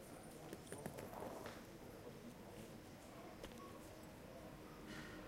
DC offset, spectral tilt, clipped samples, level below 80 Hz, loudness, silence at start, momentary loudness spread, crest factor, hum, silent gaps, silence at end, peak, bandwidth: under 0.1%; -5 dB/octave; under 0.1%; -68 dBFS; -55 LUFS; 0 s; 5 LU; 26 dB; none; none; 0 s; -30 dBFS; 16 kHz